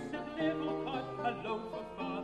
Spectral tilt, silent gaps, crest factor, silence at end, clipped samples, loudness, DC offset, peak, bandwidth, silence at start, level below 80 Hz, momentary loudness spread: -6.5 dB/octave; none; 16 dB; 0 s; under 0.1%; -37 LUFS; under 0.1%; -22 dBFS; 10.5 kHz; 0 s; -62 dBFS; 6 LU